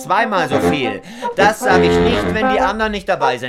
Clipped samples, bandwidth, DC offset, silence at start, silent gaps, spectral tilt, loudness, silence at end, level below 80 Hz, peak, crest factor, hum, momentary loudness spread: under 0.1%; 15.5 kHz; under 0.1%; 0 s; none; -5 dB/octave; -15 LUFS; 0 s; -38 dBFS; 0 dBFS; 14 dB; none; 7 LU